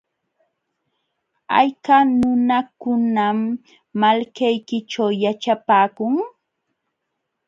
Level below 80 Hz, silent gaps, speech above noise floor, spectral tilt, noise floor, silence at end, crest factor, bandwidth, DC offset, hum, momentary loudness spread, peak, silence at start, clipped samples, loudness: -60 dBFS; none; 59 dB; -6 dB/octave; -77 dBFS; 1.2 s; 20 dB; 7.6 kHz; under 0.1%; none; 9 LU; 0 dBFS; 1.5 s; under 0.1%; -19 LUFS